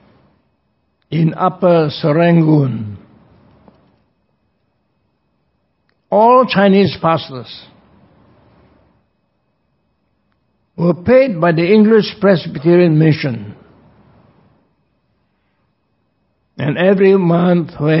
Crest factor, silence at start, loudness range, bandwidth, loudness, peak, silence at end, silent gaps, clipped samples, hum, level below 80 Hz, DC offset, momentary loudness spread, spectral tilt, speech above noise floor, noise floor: 16 dB; 1.1 s; 11 LU; 5.8 kHz; -13 LUFS; 0 dBFS; 0 s; none; under 0.1%; none; -52 dBFS; under 0.1%; 15 LU; -11.5 dB/octave; 53 dB; -64 dBFS